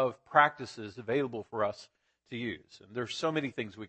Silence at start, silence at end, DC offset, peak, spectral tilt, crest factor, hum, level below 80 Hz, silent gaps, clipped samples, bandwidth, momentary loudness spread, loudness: 0 s; 0 s; under 0.1%; -8 dBFS; -5 dB/octave; 26 dB; none; -72 dBFS; none; under 0.1%; 8.8 kHz; 17 LU; -32 LUFS